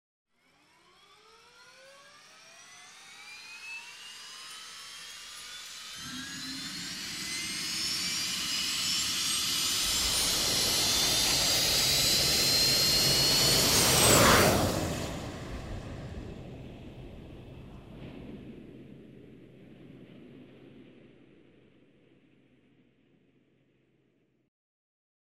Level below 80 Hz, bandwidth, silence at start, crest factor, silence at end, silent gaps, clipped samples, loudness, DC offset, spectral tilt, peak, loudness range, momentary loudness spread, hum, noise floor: -50 dBFS; 16 kHz; 2.45 s; 22 dB; 4.5 s; none; under 0.1%; -25 LUFS; under 0.1%; -1.5 dB/octave; -8 dBFS; 24 LU; 25 LU; none; -71 dBFS